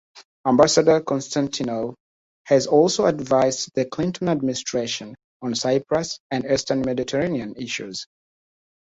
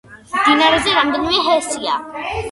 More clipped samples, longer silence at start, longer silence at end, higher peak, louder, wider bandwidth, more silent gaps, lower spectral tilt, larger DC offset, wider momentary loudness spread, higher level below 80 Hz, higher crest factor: neither; about the same, 0.15 s vs 0.1 s; first, 0.85 s vs 0 s; about the same, -2 dBFS vs 0 dBFS; second, -22 LUFS vs -16 LUFS; second, 8.2 kHz vs 11.5 kHz; first, 0.25-0.44 s, 2.00-2.45 s, 5.24-5.40 s, 6.20-6.30 s vs none; first, -4.5 dB/octave vs -2.5 dB/octave; neither; about the same, 12 LU vs 12 LU; second, -56 dBFS vs -42 dBFS; about the same, 20 dB vs 16 dB